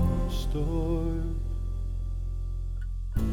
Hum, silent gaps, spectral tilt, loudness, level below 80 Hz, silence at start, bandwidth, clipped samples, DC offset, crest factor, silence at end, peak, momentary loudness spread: none; none; -8 dB/octave; -32 LUFS; -30 dBFS; 0 s; 12 kHz; under 0.1%; under 0.1%; 16 dB; 0 s; -14 dBFS; 7 LU